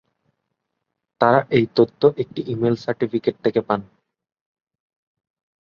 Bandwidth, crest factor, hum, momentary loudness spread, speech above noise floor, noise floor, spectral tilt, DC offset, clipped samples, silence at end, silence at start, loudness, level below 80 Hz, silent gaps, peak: 6.8 kHz; 20 dB; none; 9 LU; 59 dB; -78 dBFS; -8.5 dB/octave; under 0.1%; under 0.1%; 1.8 s; 1.2 s; -20 LUFS; -60 dBFS; none; -2 dBFS